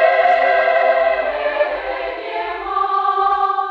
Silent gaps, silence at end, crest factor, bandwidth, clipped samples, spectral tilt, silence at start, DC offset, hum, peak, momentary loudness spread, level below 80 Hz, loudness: none; 0 s; 16 dB; 5.8 kHz; under 0.1%; -4 dB/octave; 0 s; under 0.1%; none; -2 dBFS; 10 LU; -50 dBFS; -17 LUFS